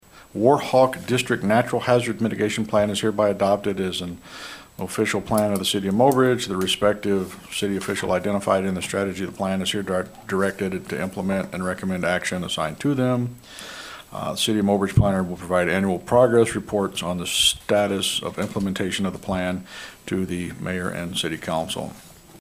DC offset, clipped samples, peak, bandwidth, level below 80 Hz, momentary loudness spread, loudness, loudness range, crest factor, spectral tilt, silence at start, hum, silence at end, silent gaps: under 0.1%; under 0.1%; -4 dBFS; 16 kHz; -48 dBFS; 11 LU; -23 LUFS; 5 LU; 18 dB; -4.5 dB/octave; 0.15 s; none; 0 s; none